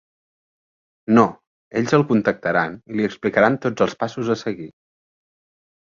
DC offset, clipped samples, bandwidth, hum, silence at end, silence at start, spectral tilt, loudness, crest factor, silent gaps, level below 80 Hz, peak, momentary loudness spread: under 0.1%; under 0.1%; 7.4 kHz; none; 1.25 s; 1.1 s; -6.5 dB/octave; -20 LUFS; 20 dB; 1.47-1.71 s; -58 dBFS; -2 dBFS; 11 LU